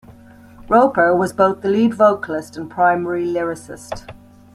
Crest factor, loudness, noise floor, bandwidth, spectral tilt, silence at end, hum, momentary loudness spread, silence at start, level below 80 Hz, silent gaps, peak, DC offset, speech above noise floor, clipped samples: 16 dB; -17 LUFS; -43 dBFS; 13.5 kHz; -6.5 dB/octave; 0.4 s; none; 17 LU; 0.1 s; -50 dBFS; none; -2 dBFS; under 0.1%; 26 dB; under 0.1%